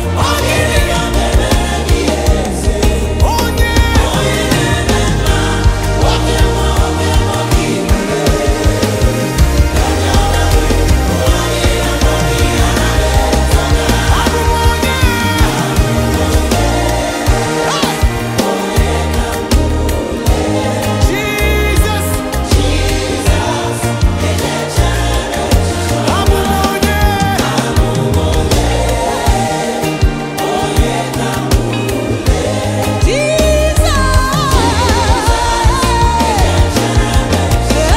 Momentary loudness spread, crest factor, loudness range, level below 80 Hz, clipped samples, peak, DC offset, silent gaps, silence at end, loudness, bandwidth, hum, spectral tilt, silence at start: 3 LU; 12 dB; 2 LU; -16 dBFS; under 0.1%; 0 dBFS; under 0.1%; none; 0 s; -13 LUFS; 16.5 kHz; none; -5 dB/octave; 0 s